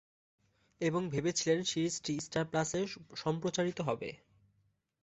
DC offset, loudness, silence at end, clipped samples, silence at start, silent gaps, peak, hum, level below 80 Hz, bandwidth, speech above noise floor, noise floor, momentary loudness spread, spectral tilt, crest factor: under 0.1%; -35 LUFS; 0.85 s; under 0.1%; 0.8 s; none; -18 dBFS; none; -68 dBFS; 8.2 kHz; 41 dB; -76 dBFS; 7 LU; -4.5 dB/octave; 18 dB